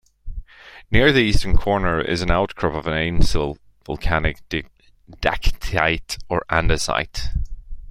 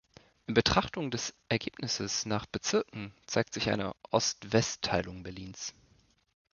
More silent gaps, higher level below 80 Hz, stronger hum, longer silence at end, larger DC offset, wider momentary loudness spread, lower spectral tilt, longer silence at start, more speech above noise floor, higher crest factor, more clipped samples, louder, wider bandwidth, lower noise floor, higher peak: neither; first, -26 dBFS vs -54 dBFS; neither; second, 0 s vs 0.85 s; neither; about the same, 15 LU vs 13 LU; first, -5 dB/octave vs -3.5 dB/octave; second, 0.25 s vs 0.5 s; second, 22 dB vs 35 dB; second, 18 dB vs 26 dB; neither; first, -21 LUFS vs -32 LUFS; first, 12.5 kHz vs 10 kHz; second, -40 dBFS vs -67 dBFS; first, 0 dBFS vs -8 dBFS